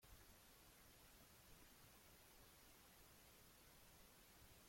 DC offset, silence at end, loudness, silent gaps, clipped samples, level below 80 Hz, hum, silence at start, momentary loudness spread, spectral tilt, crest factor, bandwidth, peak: under 0.1%; 0 s; -67 LUFS; none; under 0.1%; -76 dBFS; none; 0 s; 1 LU; -2.5 dB/octave; 14 dB; 16.5 kHz; -54 dBFS